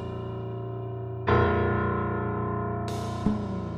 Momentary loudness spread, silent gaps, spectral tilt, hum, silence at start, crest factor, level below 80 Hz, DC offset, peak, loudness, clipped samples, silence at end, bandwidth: 11 LU; none; -8 dB/octave; none; 0 s; 18 dB; -44 dBFS; under 0.1%; -10 dBFS; -29 LUFS; under 0.1%; 0 s; 10.5 kHz